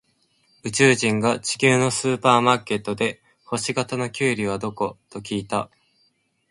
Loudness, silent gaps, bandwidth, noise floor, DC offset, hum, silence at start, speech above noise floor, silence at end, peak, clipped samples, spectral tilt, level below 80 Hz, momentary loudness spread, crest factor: -21 LUFS; none; 11.5 kHz; -66 dBFS; under 0.1%; none; 0.65 s; 45 dB; 0.85 s; -2 dBFS; under 0.1%; -4 dB/octave; -60 dBFS; 12 LU; 22 dB